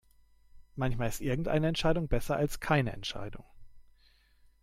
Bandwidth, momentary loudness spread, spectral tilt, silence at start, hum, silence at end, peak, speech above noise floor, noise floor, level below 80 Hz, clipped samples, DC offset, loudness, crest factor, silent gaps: 16 kHz; 14 LU; -6 dB/octave; 0.55 s; none; 0.8 s; -14 dBFS; 34 dB; -64 dBFS; -44 dBFS; under 0.1%; under 0.1%; -32 LUFS; 20 dB; none